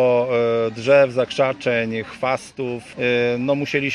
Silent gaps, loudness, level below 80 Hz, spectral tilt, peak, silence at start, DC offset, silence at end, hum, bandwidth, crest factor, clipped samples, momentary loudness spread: none; -20 LUFS; -60 dBFS; -5.5 dB/octave; -4 dBFS; 0 s; under 0.1%; 0 s; none; 11.5 kHz; 16 dB; under 0.1%; 10 LU